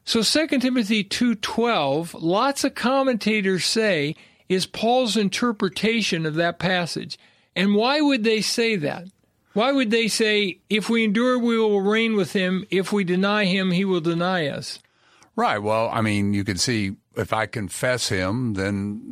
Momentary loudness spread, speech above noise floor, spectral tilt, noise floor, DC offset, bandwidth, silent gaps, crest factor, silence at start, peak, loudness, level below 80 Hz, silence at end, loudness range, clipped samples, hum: 8 LU; 35 dB; -4.5 dB/octave; -57 dBFS; under 0.1%; 14.5 kHz; none; 18 dB; 0.05 s; -4 dBFS; -22 LUFS; -60 dBFS; 0 s; 3 LU; under 0.1%; none